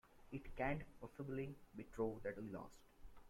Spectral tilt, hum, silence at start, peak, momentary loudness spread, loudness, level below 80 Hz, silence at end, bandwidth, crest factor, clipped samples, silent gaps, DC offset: -7.5 dB/octave; none; 0.05 s; -30 dBFS; 13 LU; -49 LUFS; -62 dBFS; 0 s; 16.5 kHz; 18 dB; under 0.1%; none; under 0.1%